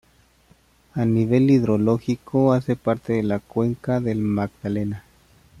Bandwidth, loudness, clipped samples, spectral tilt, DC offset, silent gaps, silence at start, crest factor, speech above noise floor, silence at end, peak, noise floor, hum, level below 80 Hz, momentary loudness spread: 12.5 kHz; -22 LUFS; under 0.1%; -9 dB/octave; under 0.1%; none; 0.95 s; 16 dB; 36 dB; 0.6 s; -6 dBFS; -57 dBFS; none; -52 dBFS; 9 LU